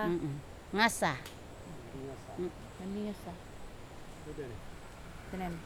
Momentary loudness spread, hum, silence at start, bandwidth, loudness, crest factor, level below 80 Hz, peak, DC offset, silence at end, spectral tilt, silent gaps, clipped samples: 20 LU; none; 0 s; over 20 kHz; -37 LUFS; 26 dB; -54 dBFS; -12 dBFS; under 0.1%; 0 s; -4.5 dB/octave; none; under 0.1%